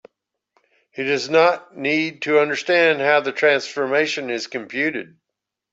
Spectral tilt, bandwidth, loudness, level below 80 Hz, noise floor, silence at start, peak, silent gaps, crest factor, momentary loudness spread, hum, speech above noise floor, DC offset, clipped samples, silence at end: -4 dB/octave; 8 kHz; -19 LUFS; -72 dBFS; -83 dBFS; 0.95 s; -2 dBFS; none; 18 dB; 10 LU; none; 63 dB; under 0.1%; under 0.1%; 0.7 s